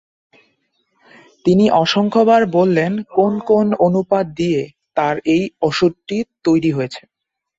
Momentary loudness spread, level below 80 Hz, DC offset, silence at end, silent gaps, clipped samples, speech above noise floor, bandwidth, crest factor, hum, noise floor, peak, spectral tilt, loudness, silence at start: 10 LU; -54 dBFS; under 0.1%; 0.6 s; none; under 0.1%; 50 dB; 8 kHz; 16 dB; none; -66 dBFS; -2 dBFS; -6.5 dB/octave; -16 LUFS; 1.45 s